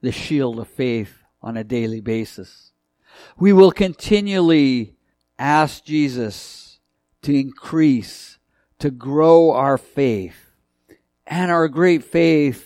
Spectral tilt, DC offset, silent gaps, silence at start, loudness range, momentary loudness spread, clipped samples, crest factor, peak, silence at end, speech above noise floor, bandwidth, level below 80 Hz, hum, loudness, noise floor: -7 dB/octave; under 0.1%; none; 0.05 s; 6 LU; 18 LU; under 0.1%; 18 dB; 0 dBFS; 0.05 s; 45 dB; 14.5 kHz; -50 dBFS; none; -18 LUFS; -62 dBFS